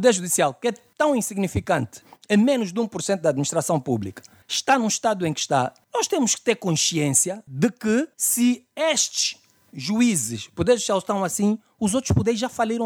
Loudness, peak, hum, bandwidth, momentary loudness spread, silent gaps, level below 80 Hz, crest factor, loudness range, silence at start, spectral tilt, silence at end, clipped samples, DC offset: -22 LUFS; -4 dBFS; none; 18 kHz; 7 LU; none; -50 dBFS; 18 dB; 2 LU; 0 s; -4 dB/octave; 0 s; under 0.1%; under 0.1%